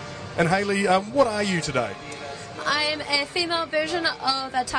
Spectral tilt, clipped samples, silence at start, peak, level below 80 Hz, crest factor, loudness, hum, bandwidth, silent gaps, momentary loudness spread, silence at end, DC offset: -4 dB/octave; under 0.1%; 0 s; -6 dBFS; -54 dBFS; 18 dB; -23 LUFS; none; 10.5 kHz; none; 11 LU; 0 s; under 0.1%